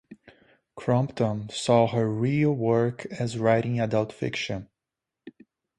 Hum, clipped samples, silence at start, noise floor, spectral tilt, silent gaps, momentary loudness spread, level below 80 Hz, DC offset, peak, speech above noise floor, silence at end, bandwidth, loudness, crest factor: none; under 0.1%; 0.1 s; -87 dBFS; -6.5 dB/octave; none; 9 LU; -60 dBFS; under 0.1%; -6 dBFS; 63 dB; 0.5 s; 11 kHz; -26 LUFS; 20 dB